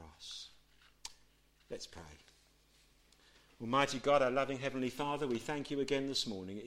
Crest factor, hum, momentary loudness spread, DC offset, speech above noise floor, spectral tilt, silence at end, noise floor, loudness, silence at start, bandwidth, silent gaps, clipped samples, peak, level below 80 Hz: 22 dB; none; 20 LU; under 0.1%; 33 dB; -4 dB/octave; 0 s; -68 dBFS; -36 LUFS; 0 s; 15.5 kHz; none; under 0.1%; -18 dBFS; -66 dBFS